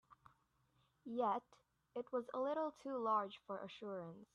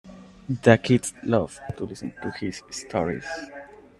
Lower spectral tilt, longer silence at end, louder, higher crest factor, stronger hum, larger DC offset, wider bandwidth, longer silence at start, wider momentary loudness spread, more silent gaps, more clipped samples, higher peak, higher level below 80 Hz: about the same, -6.5 dB/octave vs -5.5 dB/octave; second, 0.1 s vs 0.35 s; second, -43 LUFS vs -25 LUFS; second, 18 dB vs 24 dB; neither; neither; second, 10 kHz vs 12.5 kHz; about the same, 0.1 s vs 0.05 s; second, 11 LU vs 17 LU; neither; neither; second, -26 dBFS vs -2 dBFS; second, -86 dBFS vs -56 dBFS